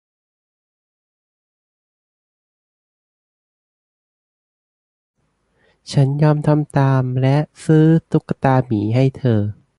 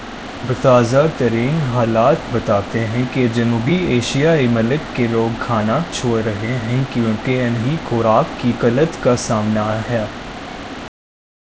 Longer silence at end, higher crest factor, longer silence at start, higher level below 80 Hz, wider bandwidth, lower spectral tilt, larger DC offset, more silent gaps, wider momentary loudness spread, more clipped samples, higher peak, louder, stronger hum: second, 0.25 s vs 0.6 s; about the same, 18 dB vs 16 dB; first, 5.9 s vs 0 s; second, -52 dBFS vs -40 dBFS; first, 11 kHz vs 8 kHz; first, -8.5 dB/octave vs -6.5 dB/octave; second, under 0.1% vs 0.3%; neither; second, 5 LU vs 10 LU; neither; about the same, -2 dBFS vs 0 dBFS; about the same, -17 LUFS vs -17 LUFS; neither